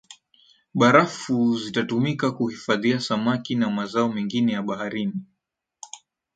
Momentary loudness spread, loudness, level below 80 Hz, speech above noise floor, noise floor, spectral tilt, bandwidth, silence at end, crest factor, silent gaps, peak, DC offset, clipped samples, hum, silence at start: 14 LU; -23 LUFS; -66 dBFS; 58 dB; -80 dBFS; -5.5 dB/octave; 9 kHz; 0.4 s; 22 dB; none; -2 dBFS; under 0.1%; under 0.1%; none; 0.1 s